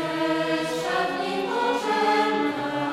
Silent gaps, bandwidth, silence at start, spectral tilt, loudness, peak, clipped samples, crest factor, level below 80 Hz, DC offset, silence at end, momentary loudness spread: none; 16 kHz; 0 s; -4.5 dB/octave; -24 LUFS; -10 dBFS; under 0.1%; 14 dB; -62 dBFS; under 0.1%; 0 s; 5 LU